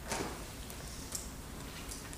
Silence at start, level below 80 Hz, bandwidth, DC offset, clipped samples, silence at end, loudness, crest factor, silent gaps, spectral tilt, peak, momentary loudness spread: 0 s; -50 dBFS; 15.5 kHz; under 0.1%; under 0.1%; 0 s; -43 LUFS; 22 dB; none; -3 dB/octave; -20 dBFS; 7 LU